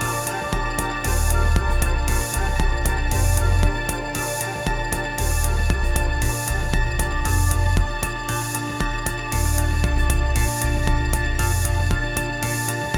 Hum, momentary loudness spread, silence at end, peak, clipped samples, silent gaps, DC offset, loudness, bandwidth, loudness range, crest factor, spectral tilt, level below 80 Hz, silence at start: none; 4 LU; 0 s; -2 dBFS; under 0.1%; none; under 0.1%; -22 LUFS; 19.5 kHz; 1 LU; 18 dB; -4.5 dB/octave; -22 dBFS; 0 s